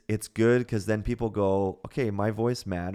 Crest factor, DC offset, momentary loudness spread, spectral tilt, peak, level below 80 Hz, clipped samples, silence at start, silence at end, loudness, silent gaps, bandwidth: 16 dB; under 0.1%; 7 LU; -7 dB/octave; -10 dBFS; -46 dBFS; under 0.1%; 0.1 s; 0 s; -27 LUFS; none; 15 kHz